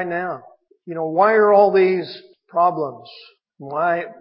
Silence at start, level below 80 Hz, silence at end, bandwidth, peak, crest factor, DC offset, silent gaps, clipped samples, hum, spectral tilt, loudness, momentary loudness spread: 0 s; -76 dBFS; 0.1 s; 5.6 kHz; -2 dBFS; 16 dB; under 0.1%; none; under 0.1%; none; -10.5 dB/octave; -18 LUFS; 20 LU